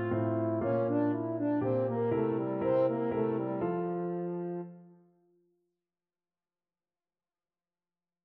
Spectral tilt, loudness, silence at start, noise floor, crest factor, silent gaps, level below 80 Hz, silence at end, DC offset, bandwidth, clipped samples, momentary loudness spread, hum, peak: -9 dB/octave; -32 LUFS; 0 s; under -90 dBFS; 16 dB; none; -68 dBFS; 3.35 s; under 0.1%; 4.3 kHz; under 0.1%; 7 LU; none; -18 dBFS